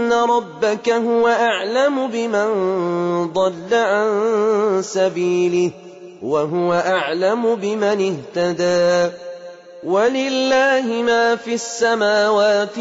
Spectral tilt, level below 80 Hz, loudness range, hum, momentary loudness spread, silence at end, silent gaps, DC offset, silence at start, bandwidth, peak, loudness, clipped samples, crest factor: -4.5 dB/octave; -64 dBFS; 1 LU; none; 6 LU; 0 s; none; under 0.1%; 0 s; 8 kHz; -6 dBFS; -18 LUFS; under 0.1%; 12 dB